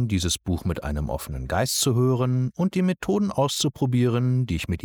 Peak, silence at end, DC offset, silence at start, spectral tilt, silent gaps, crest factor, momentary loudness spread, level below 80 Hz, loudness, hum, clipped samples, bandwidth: -10 dBFS; 0 s; under 0.1%; 0 s; -5.5 dB/octave; none; 12 dB; 7 LU; -40 dBFS; -24 LUFS; none; under 0.1%; 19 kHz